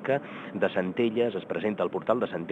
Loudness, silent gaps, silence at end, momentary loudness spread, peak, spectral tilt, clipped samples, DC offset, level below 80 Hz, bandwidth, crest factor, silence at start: -29 LUFS; none; 0 s; 4 LU; -10 dBFS; -8 dB/octave; under 0.1%; under 0.1%; -74 dBFS; 8 kHz; 18 dB; 0 s